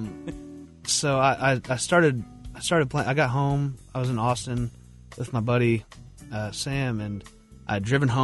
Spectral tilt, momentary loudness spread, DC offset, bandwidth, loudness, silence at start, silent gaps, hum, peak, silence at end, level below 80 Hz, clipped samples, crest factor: -5 dB/octave; 16 LU; under 0.1%; 11.5 kHz; -25 LUFS; 0 s; none; none; -6 dBFS; 0 s; -48 dBFS; under 0.1%; 20 dB